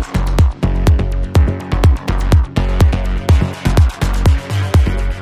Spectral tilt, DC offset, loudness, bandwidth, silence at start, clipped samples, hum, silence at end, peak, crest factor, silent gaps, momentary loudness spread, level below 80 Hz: -7 dB/octave; under 0.1%; -15 LUFS; 16 kHz; 0 s; under 0.1%; none; 0 s; -2 dBFS; 12 dB; none; 3 LU; -14 dBFS